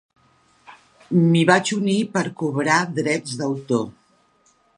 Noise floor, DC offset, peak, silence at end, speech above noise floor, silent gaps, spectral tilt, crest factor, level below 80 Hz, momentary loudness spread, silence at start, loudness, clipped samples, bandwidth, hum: -61 dBFS; under 0.1%; 0 dBFS; 0.85 s; 41 dB; none; -5.5 dB/octave; 22 dB; -68 dBFS; 8 LU; 0.7 s; -20 LUFS; under 0.1%; 11 kHz; none